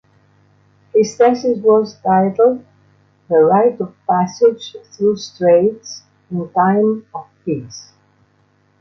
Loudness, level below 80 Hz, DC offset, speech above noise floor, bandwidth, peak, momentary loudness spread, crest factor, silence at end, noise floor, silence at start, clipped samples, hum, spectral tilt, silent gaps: -15 LUFS; -62 dBFS; under 0.1%; 42 dB; 7.4 kHz; -2 dBFS; 18 LU; 14 dB; 1 s; -57 dBFS; 0.95 s; under 0.1%; 50 Hz at -45 dBFS; -6.5 dB/octave; none